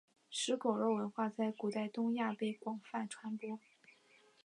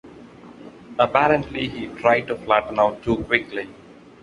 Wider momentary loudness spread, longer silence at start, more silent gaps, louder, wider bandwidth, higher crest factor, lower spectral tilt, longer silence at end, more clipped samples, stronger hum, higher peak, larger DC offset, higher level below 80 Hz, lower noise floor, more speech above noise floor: second, 9 LU vs 13 LU; first, 0.3 s vs 0.05 s; neither; second, -39 LUFS vs -21 LUFS; about the same, 11 kHz vs 10.5 kHz; about the same, 20 dB vs 22 dB; second, -4.5 dB/octave vs -6.5 dB/octave; first, 0.85 s vs 0.5 s; neither; neither; second, -20 dBFS vs -2 dBFS; neither; second, under -90 dBFS vs -48 dBFS; first, -68 dBFS vs -43 dBFS; first, 30 dB vs 22 dB